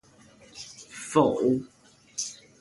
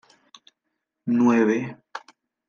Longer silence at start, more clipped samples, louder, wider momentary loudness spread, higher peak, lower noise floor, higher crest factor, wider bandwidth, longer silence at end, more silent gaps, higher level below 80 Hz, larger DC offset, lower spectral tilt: second, 0.55 s vs 1.05 s; neither; second, -27 LUFS vs -21 LUFS; about the same, 20 LU vs 22 LU; about the same, -6 dBFS vs -8 dBFS; second, -55 dBFS vs -80 dBFS; about the same, 22 dB vs 18 dB; first, 11.5 kHz vs 7 kHz; second, 0.3 s vs 0.5 s; neither; first, -66 dBFS vs -78 dBFS; neither; second, -5 dB/octave vs -7 dB/octave